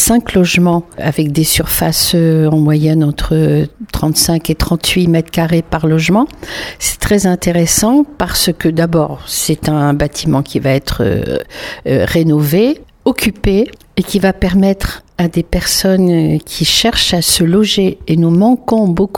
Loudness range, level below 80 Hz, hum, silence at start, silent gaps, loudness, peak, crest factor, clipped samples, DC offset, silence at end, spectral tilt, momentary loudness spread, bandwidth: 3 LU; -30 dBFS; none; 0 s; none; -12 LUFS; 0 dBFS; 12 dB; under 0.1%; under 0.1%; 0 s; -4.5 dB/octave; 7 LU; over 20 kHz